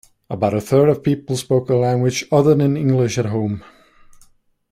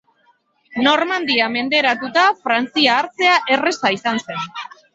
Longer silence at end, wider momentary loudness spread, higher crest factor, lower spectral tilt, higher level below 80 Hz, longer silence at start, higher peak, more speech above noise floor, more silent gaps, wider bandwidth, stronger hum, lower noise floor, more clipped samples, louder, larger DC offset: first, 1.1 s vs 0.3 s; second, 8 LU vs 11 LU; about the same, 16 dB vs 18 dB; first, -7 dB/octave vs -3 dB/octave; first, -52 dBFS vs -66 dBFS; second, 0.3 s vs 0.75 s; about the same, -2 dBFS vs -2 dBFS; second, 36 dB vs 42 dB; neither; first, 15.5 kHz vs 8 kHz; neither; second, -53 dBFS vs -60 dBFS; neither; about the same, -18 LUFS vs -16 LUFS; neither